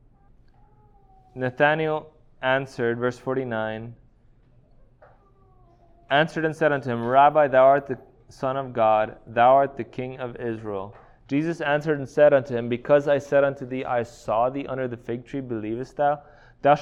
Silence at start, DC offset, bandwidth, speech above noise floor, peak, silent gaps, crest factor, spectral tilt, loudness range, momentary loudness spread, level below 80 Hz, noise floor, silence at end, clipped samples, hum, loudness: 1.35 s; under 0.1%; 10 kHz; 33 dB; -6 dBFS; none; 18 dB; -7 dB/octave; 8 LU; 14 LU; -56 dBFS; -56 dBFS; 0 s; under 0.1%; none; -23 LUFS